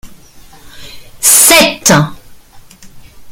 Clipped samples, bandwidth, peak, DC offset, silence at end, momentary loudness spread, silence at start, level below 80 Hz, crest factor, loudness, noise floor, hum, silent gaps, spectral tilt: 0.7%; over 20 kHz; 0 dBFS; under 0.1%; 0 s; 8 LU; 0.05 s; -40 dBFS; 12 dB; -6 LUFS; -36 dBFS; none; none; -2 dB/octave